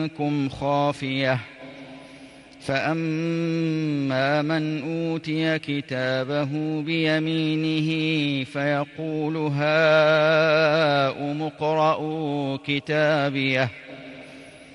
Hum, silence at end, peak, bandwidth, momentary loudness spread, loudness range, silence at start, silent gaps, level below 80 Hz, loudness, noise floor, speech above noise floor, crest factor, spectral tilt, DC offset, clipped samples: none; 0 s; -8 dBFS; 11 kHz; 11 LU; 6 LU; 0 s; none; -62 dBFS; -23 LUFS; -45 dBFS; 23 dB; 16 dB; -6.5 dB/octave; under 0.1%; under 0.1%